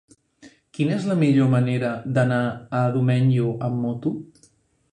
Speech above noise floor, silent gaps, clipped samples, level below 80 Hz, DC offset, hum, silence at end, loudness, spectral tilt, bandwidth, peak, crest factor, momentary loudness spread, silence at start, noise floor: 39 dB; none; under 0.1%; -60 dBFS; under 0.1%; none; 0.65 s; -22 LUFS; -8.5 dB/octave; 9.8 kHz; -6 dBFS; 16 dB; 8 LU; 0.45 s; -60 dBFS